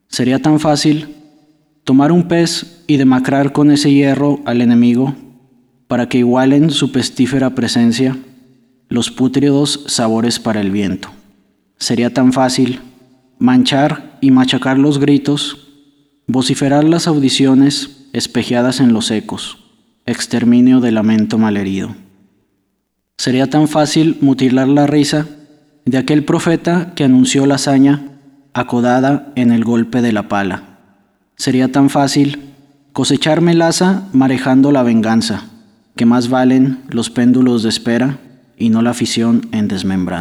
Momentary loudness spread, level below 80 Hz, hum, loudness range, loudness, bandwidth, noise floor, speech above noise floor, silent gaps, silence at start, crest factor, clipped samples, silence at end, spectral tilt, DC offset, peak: 10 LU; -52 dBFS; none; 3 LU; -13 LUFS; 13 kHz; -68 dBFS; 56 dB; none; 0.1 s; 12 dB; under 0.1%; 0 s; -5.5 dB/octave; under 0.1%; -2 dBFS